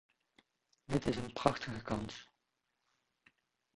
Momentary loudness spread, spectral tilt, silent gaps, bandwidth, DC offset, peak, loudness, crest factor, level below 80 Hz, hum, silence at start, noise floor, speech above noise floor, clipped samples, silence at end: 10 LU; -6 dB/octave; none; 11.5 kHz; under 0.1%; -12 dBFS; -38 LUFS; 30 dB; -60 dBFS; none; 0.9 s; -85 dBFS; 48 dB; under 0.1%; 1.5 s